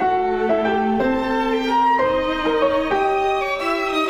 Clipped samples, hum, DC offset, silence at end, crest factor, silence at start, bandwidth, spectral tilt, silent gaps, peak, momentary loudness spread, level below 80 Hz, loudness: under 0.1%; none; under 0.1%; 0 s; 12 dB; 0 s; 15.5 kHz; -5 dB/octave; none; -8 dBFS; 3 LU; -42 dBFS; -19 LUFS